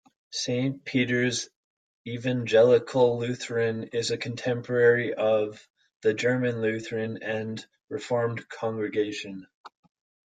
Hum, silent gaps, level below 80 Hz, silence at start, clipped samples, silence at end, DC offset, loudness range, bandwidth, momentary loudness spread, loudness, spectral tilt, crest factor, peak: none; 1.56-2.05 s, 5.70-5.74 s, 5.96-6.00 s, 7.84-7.88 s, 9.54-9.64 s; -68 dBFS; 0.3 s; under 0.1%; 0.6 s; under 0.1%; 6 LU; 9.4 kHz; 15 LU; -26 LUFS; -5 dB/octave; 18 dB; -8 dBFS